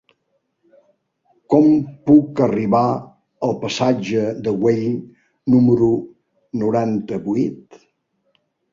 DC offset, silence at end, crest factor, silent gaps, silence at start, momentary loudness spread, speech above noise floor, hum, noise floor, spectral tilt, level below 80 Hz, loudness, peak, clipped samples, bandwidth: under 0.1%; 1.15 s; 18 dB; none; 1.5 s; 11 LU; 53 dB; none; -70 dBFS; -7.5 dB/octave; -56 dBFS; -18 LUFS; -2 dBFS; under 0.1%; 7.6 kHz